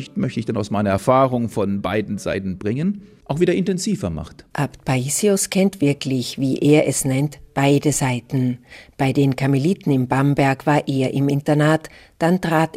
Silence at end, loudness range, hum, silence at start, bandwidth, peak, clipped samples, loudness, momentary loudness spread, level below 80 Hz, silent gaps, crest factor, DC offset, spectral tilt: 0.1 s; 4 LU; none; 0 s; 16 kHz; -2 dBFS; under 0.1%; -20 LUFS; 8 LU; -50 dBFS; none; 16 dB; under 0.1%; -5.5 dB/octave